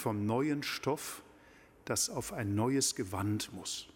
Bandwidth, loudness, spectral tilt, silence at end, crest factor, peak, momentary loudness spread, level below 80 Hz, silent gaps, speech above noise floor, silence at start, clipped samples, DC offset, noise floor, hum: 17 kHz; -34 LUFS; -4 dB/octave; 0.05 s; 18 dB; -18 dBFS; 9 LU; -66 dBFS; none; 26 dB; 0 s; under 0.1%; under 0.1%; -60 dBFS; none